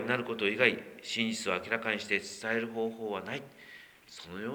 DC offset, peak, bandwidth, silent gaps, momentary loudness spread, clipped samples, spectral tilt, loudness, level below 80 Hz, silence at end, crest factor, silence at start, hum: under 0.1%; -8 dBFS; over 20 kHz; none; 22 LU; under 0.1%; -3.5 dB/octave; -32 LUFS; -74 dBFS; 0 s; 26 dB; 0 s; none